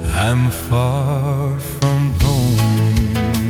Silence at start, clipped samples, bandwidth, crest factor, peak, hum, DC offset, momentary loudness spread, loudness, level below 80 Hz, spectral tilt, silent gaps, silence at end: 0 s; under 0.1%; 19.5 kHz; 12 dB; -4 dBFS; none; under 0.1%; 4 LU; -17 LUFS; -28 dBFS; -6 dB/octave; none; 0 s